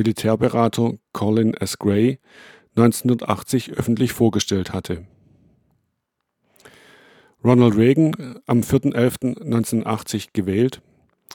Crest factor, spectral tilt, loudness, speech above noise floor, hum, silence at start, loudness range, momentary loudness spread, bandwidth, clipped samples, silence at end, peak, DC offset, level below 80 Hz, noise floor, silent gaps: 20 dB; -6.5 dB/octave; -20 LUFS; 58 dB; none; 0 s; 6 LU; 10 LU; 18.5 kHz; under 0.1%; 0.6 s; -2 dBFS; under 0.1%; -52 dBFS; -77 dBFS; none